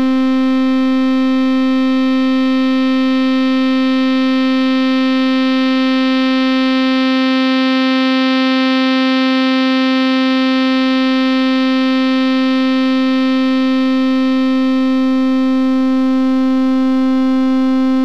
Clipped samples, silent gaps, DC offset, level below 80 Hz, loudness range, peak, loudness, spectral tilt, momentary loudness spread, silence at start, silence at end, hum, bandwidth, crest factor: under 0.1%; none; 2%; -62 dBFS; 1 LU; -8 dBFS; -13 LUFS; -4 dB/octave; 1 LU; 0 s; 0 s; none; 6.6 kHz; 6 dB